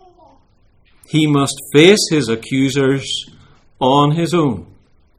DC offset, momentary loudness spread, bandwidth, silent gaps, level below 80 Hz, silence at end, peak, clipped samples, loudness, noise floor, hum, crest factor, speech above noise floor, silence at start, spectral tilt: under 0.1%; 11 LU; 16 kHz; none; -50 dBFS; 0.55 s; 0 dBFS; under 0.1%; -15 LUFS; -53 dBFS; none; 16 dB; 39 dB; 1.15 s; -5 dB/octave